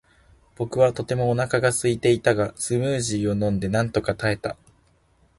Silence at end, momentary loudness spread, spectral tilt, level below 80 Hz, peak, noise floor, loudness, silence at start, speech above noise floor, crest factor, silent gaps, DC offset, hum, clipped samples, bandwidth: 0.85 s; 8 LU; -5.5 dB/octave; -48 dBFS; -4 dBFS; -61 dBFS; -23 LUFS; 0.6 s; 39 dB; 20 dB; none; under 0.1%; none; under 0.1%; 11.5 kHz